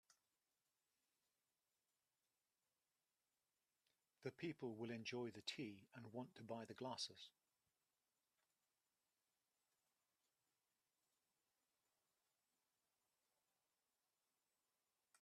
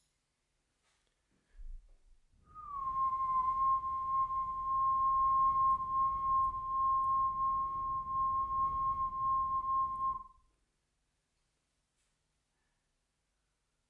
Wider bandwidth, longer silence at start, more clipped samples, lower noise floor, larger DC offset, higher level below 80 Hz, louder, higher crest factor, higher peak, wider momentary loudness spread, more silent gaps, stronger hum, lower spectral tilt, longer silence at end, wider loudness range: first, 13 kHz vs 3.4 kHz; first, 4.2 s vs 1.55 s; neither; first, under -90 dBFS vs -82 dBFS; neither; second, under -90 dBFS vs -56 dBFS; second, -53 LUFS vs -33 LUFS; first, 26 dB vs 12 dB; second, -34 dBFS vs -24 dBFS; about the same, 7 LU vs 7 LU; neither; neither; second, -4.5 dB/octave vs -7 dB/octave; first, 7.9 s vs 3.6 s; about the same, 7 LU vs 9 LU